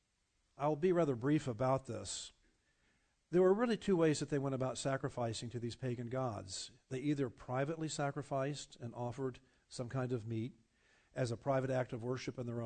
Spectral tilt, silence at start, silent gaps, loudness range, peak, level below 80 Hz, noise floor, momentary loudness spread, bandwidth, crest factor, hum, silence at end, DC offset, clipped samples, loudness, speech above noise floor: -6 dB/octave; 0.6 s; none; 6 LU; -20 dBFS; -68 dBFS; -80 dBFS; 12 LU; 9 kHz; 18 dB; none; 0 s; under 0.1%; under 0.1%; -38 LUFS; 43 dB